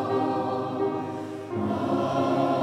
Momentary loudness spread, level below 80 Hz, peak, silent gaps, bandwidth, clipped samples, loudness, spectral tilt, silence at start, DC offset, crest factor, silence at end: 9 LU; -64 dBFS; -12 dBFS; none; 12 kHz; under 0.1%; -27 LUFS; -7.5 dB/octave; 0 s; under 0.1%; 14 dB; 0 s